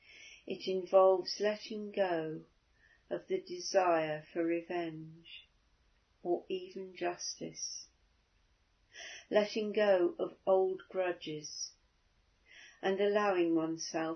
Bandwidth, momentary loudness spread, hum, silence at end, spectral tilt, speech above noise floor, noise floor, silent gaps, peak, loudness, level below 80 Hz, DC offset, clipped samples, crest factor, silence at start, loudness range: 6.4 kHz; 17 LU; none; 0 s; -3.5 dB/octave; 39 dB; -72 dBFS; none; -14 dBFS; -34 LUFS; -76 dBFS; under 0.1%; under 0.1%; 20 dB; 0.1 s; 8 LU